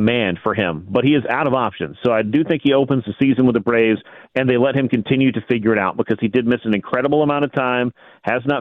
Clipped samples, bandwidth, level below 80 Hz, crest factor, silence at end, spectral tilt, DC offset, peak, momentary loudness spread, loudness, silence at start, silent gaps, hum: under 0.1%; 4.2 kHz; -54 dBFS; 14 dB; 0 s; -9 dB/octave; under 0.1%; -4 dBFS; 5 LU; -18 LUFS; 0 s; none; none